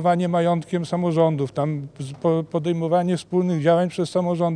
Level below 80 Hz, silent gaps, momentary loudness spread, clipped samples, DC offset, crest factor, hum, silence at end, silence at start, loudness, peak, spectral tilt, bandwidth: -64 dBFS; none; 6 LU; under 0.1%; under 0.1%; 16 dB; none; 0 s; 0 s; -22 LUFS; -6 dBFS; -7.5 dB/octave; 10 kHz